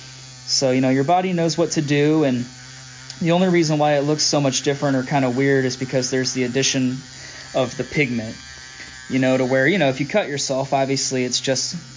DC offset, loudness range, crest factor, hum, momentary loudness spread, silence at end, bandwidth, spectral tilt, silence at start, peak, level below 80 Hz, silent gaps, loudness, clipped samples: under 0.1%; 3 LU; 14 dB; none; 17 LU; 0 s; 7.8 kHz; -4.5 dB/octave; 0 s; -6 dBFS; -56 dBFS; none; -19 LUFS; under 0.1%